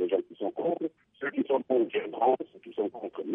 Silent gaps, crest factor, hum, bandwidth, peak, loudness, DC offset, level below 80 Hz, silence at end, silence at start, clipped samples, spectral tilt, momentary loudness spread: none; 16 dB; none; 3.8 kHz; -14 dBFS; -31 LUFS; under 0.1%; -84 dBFS; 0 s; 0 s; under 0.1%; -9 dB/octave; 10 LU